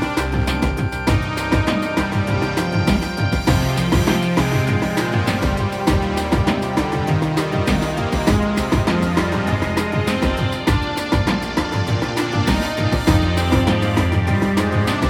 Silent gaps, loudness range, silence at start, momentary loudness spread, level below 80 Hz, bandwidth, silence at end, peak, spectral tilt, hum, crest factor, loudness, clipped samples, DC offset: none; 1 LU; 0 s; 3 LU; -28 dBFS; 17.5 kHz; 0 s; -2 dBFS; -6 dB/octave; none; 16 dB; -19 LUFS; under 0.1%; under 0.1%